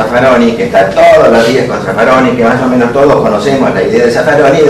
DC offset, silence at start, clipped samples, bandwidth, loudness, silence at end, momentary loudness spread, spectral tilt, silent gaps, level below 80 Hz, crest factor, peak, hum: under 0.1%; 0 s; 3%; 13.5 kHz; -7 LUFS; 0 s; 5 LU; -6 dB/octave; none; -36 dBFS; 6 dB; 0 dBFS; none